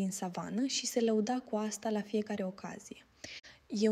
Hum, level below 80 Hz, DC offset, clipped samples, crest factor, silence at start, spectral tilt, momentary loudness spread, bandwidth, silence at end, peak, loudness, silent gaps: none; -76 dBFS; under 0.1%; under 0.1%; 16 dB; 0 s; -4.5 dB/octave; 17 LU; 15.5 kHz; 0 s; -18 dBFS; -35 LUFS; none